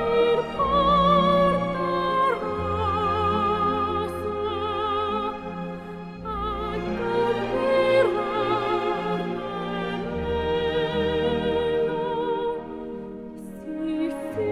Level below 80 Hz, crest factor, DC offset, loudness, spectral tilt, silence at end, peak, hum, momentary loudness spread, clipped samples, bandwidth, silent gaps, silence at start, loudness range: -44 dBFS; 16 dB; under 0.1%; -24 LUFS; -7 dB/octave; 0 s; -8 dBFS; none; 13 LU; under 0.1%; 13 kHz; none; 0 s; 6 LU